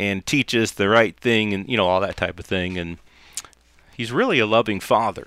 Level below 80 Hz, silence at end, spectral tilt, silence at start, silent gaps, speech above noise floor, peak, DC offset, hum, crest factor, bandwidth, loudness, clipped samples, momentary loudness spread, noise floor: -50 dBFS; 0 s; -4.5 dB/octave; 0 s; none; 32 dB; -2 dBFS; under 0.1%; none; 18 dB; 16 kHz; -20 LUFS; under 0.1%; 17 LU; -53 dBFS